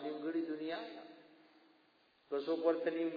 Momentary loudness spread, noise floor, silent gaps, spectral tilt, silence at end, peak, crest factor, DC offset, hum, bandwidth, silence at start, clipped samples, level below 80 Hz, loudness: 16 LU; -71 dBFS; none; -3.5 dB/octave; 0 s; -20 dBFS; 20 dB; under 0.1%; none; 5 kHz; 0 s; under 0.1%; -90 dBFS; -39 LUFS